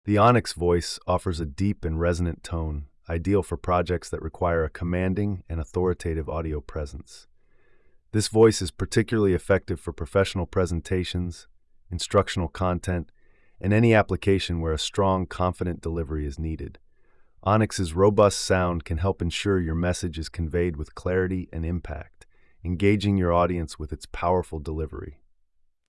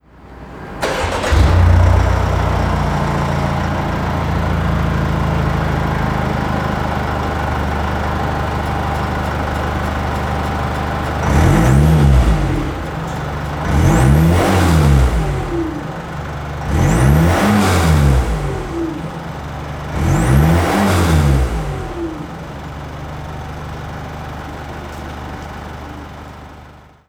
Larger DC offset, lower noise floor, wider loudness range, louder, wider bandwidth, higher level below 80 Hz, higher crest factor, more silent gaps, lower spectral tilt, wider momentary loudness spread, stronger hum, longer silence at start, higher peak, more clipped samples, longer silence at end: neither; first, -64 dBFS vs -40 dBFS; second, 4 LU vs 12 LU; second, -25 LUFS vs -16 LUFS; second, 12 kHz vs 17 kHz; second, -42 dBFS vs -22 dBFS; about the same, 18 dB vs 14 dB; neither; about the same, -6 dB/octave vs -6.5 dB/octave; second, 13 LU vs 16 LU; neither; second, 0.05 s vs 0.2 s; second, -8 dBFS vs 0 dBFS; neither; first, 0.75 s vs 0.3 s